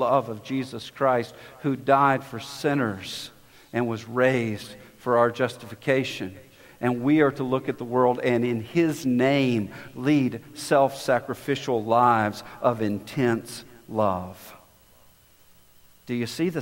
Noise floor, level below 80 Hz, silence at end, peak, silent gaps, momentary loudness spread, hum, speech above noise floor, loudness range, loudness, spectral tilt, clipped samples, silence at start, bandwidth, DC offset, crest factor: -56 dBFS; -64 dBFS; 0 s; -4 dBFS; none; 14 LU; none; 31 dB; 5 LU; -25 LUFS; -6 dB/octave; under 0.1%; 0 s; 16 kHz; under 0.1%; 20 dB